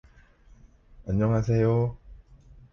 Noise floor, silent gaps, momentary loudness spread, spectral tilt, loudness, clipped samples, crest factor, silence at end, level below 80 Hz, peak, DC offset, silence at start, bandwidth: -55 dBFS; none; 8 LU; -9.5 dB/octave; -25 LUFS; under 0.1%; 14 dB; 0.55 s; -46 dBFS; -14 dBFS; under 0.1%; 1.05 s; 6.8 kHz